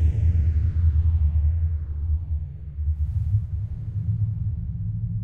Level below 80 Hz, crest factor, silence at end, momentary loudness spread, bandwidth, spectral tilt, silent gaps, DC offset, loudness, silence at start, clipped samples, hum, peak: -26 dBFS; 12 dB; 0 s; 9 LU; 2.1 kHz; -11 dB/octave; none; under 0.1%; -25 LUFS; 0 s; under 0.1%; none; -10 dBFS